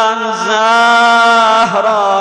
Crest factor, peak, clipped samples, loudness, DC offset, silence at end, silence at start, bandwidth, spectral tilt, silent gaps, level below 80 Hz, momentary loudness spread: 6 dB; -4 dBFS; under 0.1%; -9 LUFS; under 0.1%; 0 s; 0 s; 11 kHz; -2.5 dB/octave; none; -56 dBFS; 6 LU